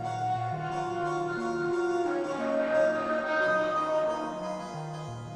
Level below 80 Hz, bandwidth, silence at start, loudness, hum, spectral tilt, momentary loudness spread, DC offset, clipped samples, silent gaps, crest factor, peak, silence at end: -64 dBFS; 10.5 kHz; 0 s; -30 LUFS; none; -6 dB/octave; 10 LU; under 0.1%; under 0.1%; none; 14 dB; -16 dBFS; 0 s